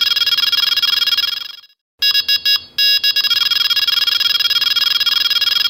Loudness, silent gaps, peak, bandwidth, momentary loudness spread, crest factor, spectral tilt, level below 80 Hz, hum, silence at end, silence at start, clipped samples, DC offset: -12 LUFS; 1.81-1.98 s; 0 dBFS; 16.5 kHz; 3 LU; 14 dB; 2.5 dB/octave; -60 dBFS; none; 0 s; 0 s; under 0.1%; under 0.1%